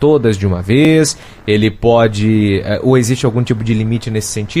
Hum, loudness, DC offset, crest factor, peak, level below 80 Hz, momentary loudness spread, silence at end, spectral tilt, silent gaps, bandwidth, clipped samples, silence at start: none; -13 LUFS; under 0.1%; 12 dB; 0 dBFS; -36 dBFS; 7 LU; 0 s; -6 dB/octave; none; 14.5 kHz; under 0.1%; 0 s